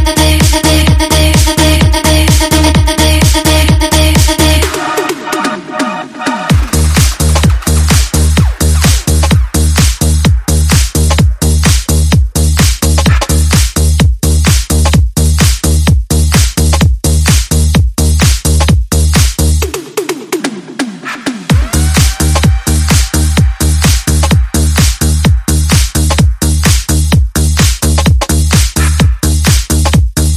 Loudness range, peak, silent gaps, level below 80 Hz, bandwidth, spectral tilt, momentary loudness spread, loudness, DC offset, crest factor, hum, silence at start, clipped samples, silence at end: 4 LU; 0 dBFS; none; -14 dBFS; 15.5 kHz; -4.5 dB/octave; 6 LU; -9 LUFS; under 0.1%; 8 dB; none; 0 s; 0.2%; 0 s